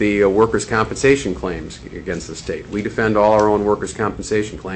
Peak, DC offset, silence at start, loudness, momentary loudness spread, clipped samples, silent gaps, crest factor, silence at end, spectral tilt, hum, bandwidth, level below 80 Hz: -2 dBFS; under 0.1%; 0 s; -18 LUFS; 13 LU; under 0.1%; none; 16 dB; 0 s; -5.5 dB/octave; none; 8.6 kHz; -38 dBFS